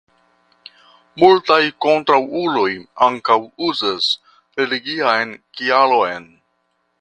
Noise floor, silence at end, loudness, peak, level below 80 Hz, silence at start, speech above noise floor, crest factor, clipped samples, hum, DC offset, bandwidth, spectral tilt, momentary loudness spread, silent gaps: -67 dBFS; 0.8 s; -17 LUFS; 0 dBFS; -62 dBFS; 1.15 s; 51 dB; 18 dB; under 0.1%; none; under 0.1%; 9.2 kHz; -4.5 dB/octave; 10 LU; none